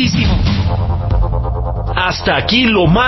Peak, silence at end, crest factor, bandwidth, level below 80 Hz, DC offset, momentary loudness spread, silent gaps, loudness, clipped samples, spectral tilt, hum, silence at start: 0 dBFS; 0 s; 12 dB; 6.2 kHz; -20 dBFS; under 0.1%; 8 LU; none; -14 LUFS; under 0.1%; -6 dB/octave; none; 0 s